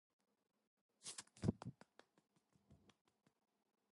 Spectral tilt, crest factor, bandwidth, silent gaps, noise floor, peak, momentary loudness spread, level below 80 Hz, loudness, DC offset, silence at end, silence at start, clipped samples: -5.5 dB/octave; 30 dB; 11.5 kHz; none; -74 dBFS; -24 dBFS; 22 LU; -70 dBFS; -49 LUFS; under 0.1%; 1.2 s; 1.05 s; under 0.1%